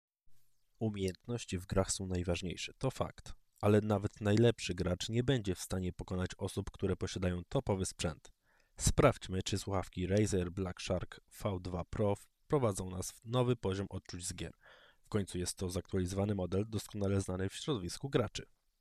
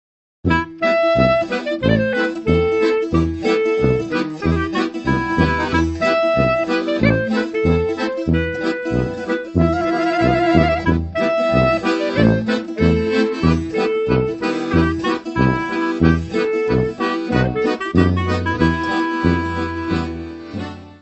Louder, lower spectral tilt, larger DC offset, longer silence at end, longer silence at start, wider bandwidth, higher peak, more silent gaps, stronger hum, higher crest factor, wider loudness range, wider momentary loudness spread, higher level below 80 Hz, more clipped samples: second, -36 LUFS vs -18 LUFS; second, -5.5 dB/octave vs -7.5 dB/octave; neither; first, 0.35 s vs 0.05 s; second, 0.3 s vs 0.45 s; first, 14.5 kHz vs 8.4 kHz; second, -16 dBFS vs 0 dBFS; neither; neither; about the same, 20 dB vs 18 dB; about the same, 4 LU vs 2 LU; first, 11 LU vs 6 LU; second, -54 dBFS vs -32 dBFS; neither